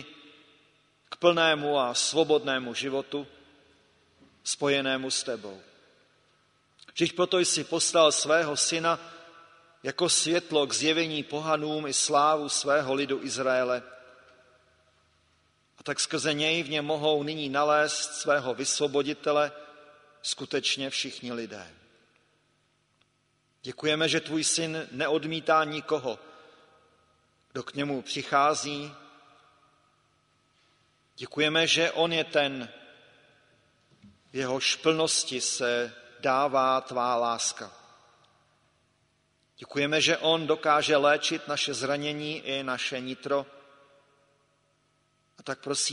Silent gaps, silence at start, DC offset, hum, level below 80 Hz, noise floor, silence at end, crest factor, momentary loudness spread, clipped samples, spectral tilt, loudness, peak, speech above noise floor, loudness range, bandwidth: none; 0 s; under 0.1%; none; -74 dBFS; -71 dBFS; 0 s; 22 dB; 14 LU; under 0.1%; -2.5 dB/octave; -27 LUFS; -8 dBFS; 44 dB; 7 LU; 10.5 kHz